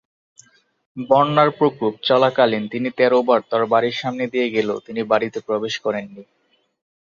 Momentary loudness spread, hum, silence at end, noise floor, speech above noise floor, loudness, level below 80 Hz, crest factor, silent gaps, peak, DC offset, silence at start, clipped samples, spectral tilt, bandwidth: 10 LU; none; 0.85 s; -53 dBFS; 34 dB; -19 LUFS; -66 dBFS; 18 dB; none; -2 dBFS; under 0.1%; 0.95 s; under 0.1%; -6 dB/octave; 7.4 kHz